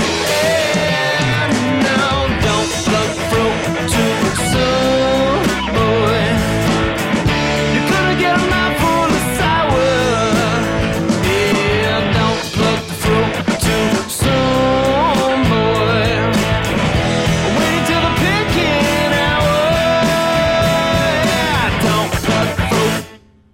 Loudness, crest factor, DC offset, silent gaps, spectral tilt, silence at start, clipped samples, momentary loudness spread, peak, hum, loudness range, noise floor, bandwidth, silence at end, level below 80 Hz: -15 LUFS; 10 dB; under 0.1%; none; -4.5 dB/octave; 0 s; under 0.1%; 3 LU; -4 dBFS; none; 1 LU; -40 dBFS; 16.5 kHz; 0.35 s; -30 dBFS